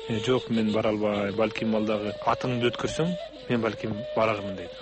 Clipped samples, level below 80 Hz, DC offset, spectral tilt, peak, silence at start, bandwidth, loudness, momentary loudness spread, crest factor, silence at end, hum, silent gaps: under 0.1%; -54 dBFS; under 0.1%; -6 dB/octave; -12 dBFS; 0 s; 8.4 kHz; -27 LUFS; 5 LU; 16 dB; 0 s; none; none